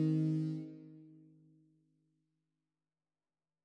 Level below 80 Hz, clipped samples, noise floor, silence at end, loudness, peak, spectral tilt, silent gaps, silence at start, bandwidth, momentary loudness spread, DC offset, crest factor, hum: under -90 dBFS; under 0.1%; under -90 dBFS; 2.55 s; -36 LUFS; -26 dBFS; -10 dB/octave; none; 0 s; 6 kHz; 23 LU; under 0.1%; 16 dB; none